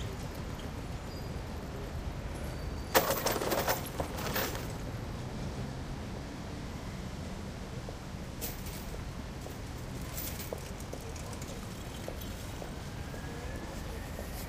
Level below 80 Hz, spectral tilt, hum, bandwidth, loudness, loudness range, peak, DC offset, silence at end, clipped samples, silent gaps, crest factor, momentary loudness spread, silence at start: -44 dBFS; -4.5 dB/octave; none; 16 kHz; -38 LUFS; 8 LU; -8 dBFS; under 0.1%; 0 s; under 0.1%; none; 30 dB; 11 LU; 0 s